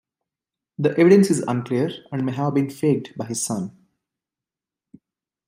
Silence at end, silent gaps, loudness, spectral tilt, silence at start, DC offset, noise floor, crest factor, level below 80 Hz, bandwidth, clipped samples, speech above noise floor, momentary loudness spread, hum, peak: 1.8 s; none; -21 LUFS; -6 dB/octave; 0.8 s; under 0.1%; -89 dBFS; 20 dB; -66 dBFS; 16 kHz; under 0.1%; 69 dB; 14 LU; none; -2 dBFS